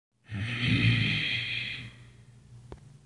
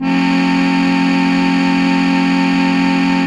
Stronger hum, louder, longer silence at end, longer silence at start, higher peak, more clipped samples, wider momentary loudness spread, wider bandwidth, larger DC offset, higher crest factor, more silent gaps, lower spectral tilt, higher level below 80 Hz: neither; second, -28 LUFS vs -13 LUFS; about the same, 0.1 s vs 0 s; first, 0.3 s vs 0 s; second, -12 dBFS vs -2 dBFS; neither; first, 22 LU vs 0 LU; about the same, 10.5 kHz vs 9.8 kHz; neither; first, 18 dB vs 12 dB; neither; about the same, -5.5 dB/octave vs -6 dB/octave; second, -52 dBFS vs -46 dBFS